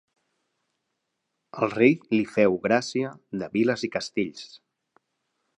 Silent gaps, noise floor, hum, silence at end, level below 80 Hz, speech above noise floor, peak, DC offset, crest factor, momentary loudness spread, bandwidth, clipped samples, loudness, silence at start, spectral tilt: none; -80 dBFS; none; 1 s; -68 dBFS; 55 dB; -6 dBFS; under 0.1%; 22 dB; 13 LU; 10.5 kHz; under 0.1%; -25 LUFS; 1.55 s; -5.5 dB/octave